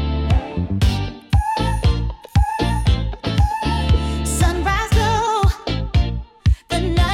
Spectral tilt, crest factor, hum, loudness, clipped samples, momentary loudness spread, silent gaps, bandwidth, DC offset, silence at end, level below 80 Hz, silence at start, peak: -5.5 dB/octave; 12 dB; none; -20 LUFS; under 0.1%; 4 LU; none; 14.5 kHz; under 0.1%; 0 s; -22 dBFS; 0 s; -6 dBFS